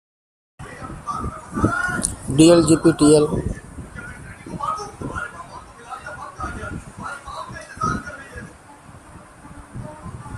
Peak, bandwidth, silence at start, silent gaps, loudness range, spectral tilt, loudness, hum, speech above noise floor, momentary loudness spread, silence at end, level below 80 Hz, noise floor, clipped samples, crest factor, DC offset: 0 dBFS; 14 kHz; 0.6 s; none; 14 LU; -5.5 dB/octave; -19 LUFS; none; 30 dB; 24 LU; 0 s; -42 dBFS; -44 dBFS; under 0.1%; 22 dB; under 0.1%